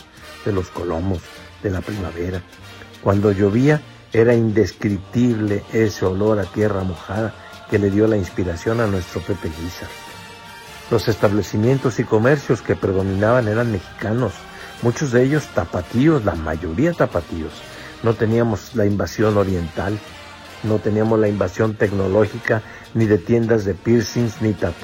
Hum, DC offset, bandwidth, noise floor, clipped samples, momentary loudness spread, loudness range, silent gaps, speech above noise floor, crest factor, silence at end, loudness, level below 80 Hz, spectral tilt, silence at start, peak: none; under 0.1%; 16.5 kHz; -38 dBFS; under 0.1%; 13 LU; 4 LU; none; 19 dB; 16 dB; 0 s; -20 LUFS; -44 dBFS; -7 dB/octave; 0.15 s; -2 dBFS